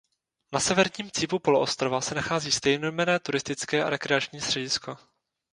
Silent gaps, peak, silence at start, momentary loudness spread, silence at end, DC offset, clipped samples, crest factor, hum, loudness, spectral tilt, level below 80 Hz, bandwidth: none; -4 dBFS; 0.5 s; 6 LU; 0.6 s; under 0.1%; under 0.1%; 24 dB; none; -26 LUFS; -3 dB/octave; -60 dBFS; 11 kHz